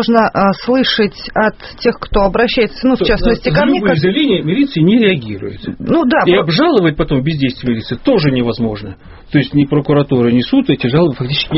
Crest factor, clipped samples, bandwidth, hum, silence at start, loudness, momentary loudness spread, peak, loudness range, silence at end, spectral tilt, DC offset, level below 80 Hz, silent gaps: 12 dB; under 0.1%; 6 kHz; none; 0 s; -13 LUFS; 7 LU; 0 dBFS; 2 LU; 0 s; -5 dB/octave; under 0.1%; -30 dBFS; none